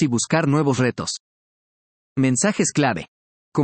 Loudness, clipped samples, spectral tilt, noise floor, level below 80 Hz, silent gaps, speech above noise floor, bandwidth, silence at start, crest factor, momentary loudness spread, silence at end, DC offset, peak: -21 LUFS; under 0.1%; -5 dB/octave; under -90 dBFS; -60 dBFS; 1.20-2.16 s, 3.08-3.52 s; over 70 dB; 8.8 kHz; 0 s; 18 dB; 11 LU; 0 s; under 0.1%; -4 dBFS